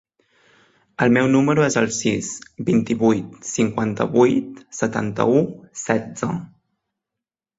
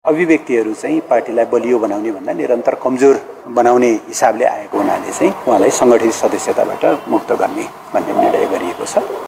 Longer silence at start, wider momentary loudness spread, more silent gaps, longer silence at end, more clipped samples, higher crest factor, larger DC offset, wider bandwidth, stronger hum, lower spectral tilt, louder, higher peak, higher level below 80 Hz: first, 1 s vs 0.05 s; first, 11 LU vs 8 LU; neither; first, 1.1 s vs 0 s; neither; about the same, 18 dB vs 14 dB; neither; second, 8 kHz vs 16 kHz; neither; about the same, -5.5 dB/octave vs -4.5 dB/octave; second, -20 LUFS vs -15 LUFS; about the same, -2 dBFS vs 0 dBFS; about the same, -56 dBFS vs -60 dBFS